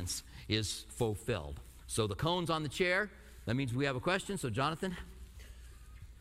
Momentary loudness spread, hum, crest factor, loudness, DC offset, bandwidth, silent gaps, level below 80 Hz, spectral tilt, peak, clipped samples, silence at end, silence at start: 21 LU; none; 20 dB; -35 LUFS; under 0.1%; 16 kHz; none; -52 dBFS; -4.5 dB/octave; -16 dBFS; under 0.1%; 0 s; 0 s